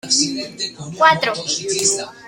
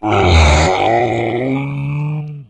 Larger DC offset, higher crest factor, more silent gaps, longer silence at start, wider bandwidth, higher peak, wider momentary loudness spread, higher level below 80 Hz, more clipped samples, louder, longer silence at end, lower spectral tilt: neither; about the same, 18 dB vs 14 dB; neither; about the same, 0.05 s vs 0 s; first, 16.5 kHz vs 9.4 kHz; about the same, -2 dBFS vs 0 dBFS; about the same, 12 LU vs 10 LU; second, -58 dBFS vs -22 dBFS; neither; second, -17 LUFS vs -14 LUFS; about the same, 0 s vs 0.05 s; second, -1.5 dB/octave vs -5.5 dB/octave